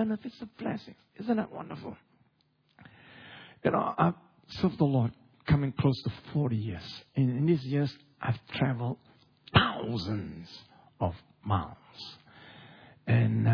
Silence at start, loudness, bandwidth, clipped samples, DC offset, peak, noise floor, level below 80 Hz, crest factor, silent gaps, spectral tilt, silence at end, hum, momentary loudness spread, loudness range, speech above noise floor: 0 s; -30 LUFS; 5.4 kHz; under 0.1%; under 0.1%; -6 dBFS; -71 dBFS; -54 dBFS; 24 dB; none; -8.5 dB/octave; 0 s; none; 19 LU; 7 LU; 41 dB